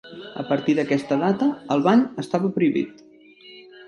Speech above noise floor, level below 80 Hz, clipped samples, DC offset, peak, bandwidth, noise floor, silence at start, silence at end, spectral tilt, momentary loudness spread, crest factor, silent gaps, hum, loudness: 27 dB; -68 dBFS; under 0.1%; under 0.1%; -4 dBFS; 11.5 kHz; -48 dBFS; 0.05 s; 0.05 s; -7 dB/octave; 10 LU; 18 dB; none; none; -22 LUFS